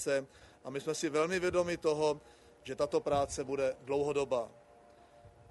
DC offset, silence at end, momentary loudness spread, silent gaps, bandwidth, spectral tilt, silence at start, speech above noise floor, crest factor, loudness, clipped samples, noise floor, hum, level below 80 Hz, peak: under 0.1%; 0.2 s; 13 LU; none; 11.5 kHz; -4.5 dB/octave; 0 s; 26 dB; 16 dB; -34 LUFS; under 0.1%; -60 dBFS; none; -62 dBFS; -18 dBFS